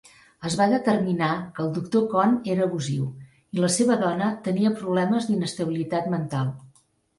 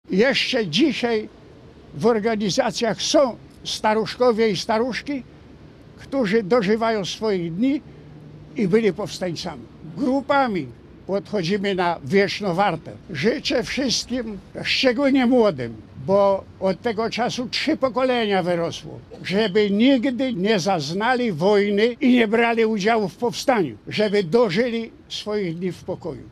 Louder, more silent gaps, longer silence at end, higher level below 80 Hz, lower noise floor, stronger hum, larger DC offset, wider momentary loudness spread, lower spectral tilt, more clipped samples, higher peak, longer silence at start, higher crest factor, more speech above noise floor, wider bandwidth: second, -24 LUFS vs -21 LUFS; neither; first, 0.5 s vs 0 s; second, -64 dBFS vs -54 dBFS; first, -60 dBFS vs -45 dBFS; neither; neither; second, 8 LU vs 13 LU; about the same, -6 dB/octave vs -5 dB/octave; neither; second, -8 dBFS vs -4 dBFS; first, 0.4 s vs 0.1 s; about the same, 16 dB vs 18 dB; first, 37 dB vs 24 dB; second, 11.5 kHz vs 13.5 kHz